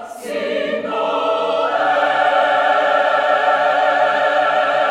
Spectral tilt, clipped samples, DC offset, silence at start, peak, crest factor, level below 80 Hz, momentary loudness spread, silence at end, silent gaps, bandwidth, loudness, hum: -3 dB/octave; under 0.1%; under 0.1%; 0 s; -4 dBFS; 14 dB; -72 dBFS; 6 LU; 0 s; none; 13 kHz; -16 LUFS; none